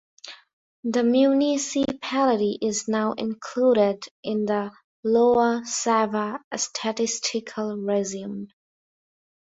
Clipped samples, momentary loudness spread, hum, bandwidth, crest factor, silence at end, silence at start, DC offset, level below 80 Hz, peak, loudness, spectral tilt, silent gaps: under 0.1%; 14 LU; none; 8.4 kHz; 16 dB; 1 s; 0.25 s; under 0.1%; -66 dBFS; -8 dBFS; -24 LUFS; -4 dB/octave; 0.53-0.83 s, 4.11-4.23 s, 4.84-5.03 s, 6.44-6.51 s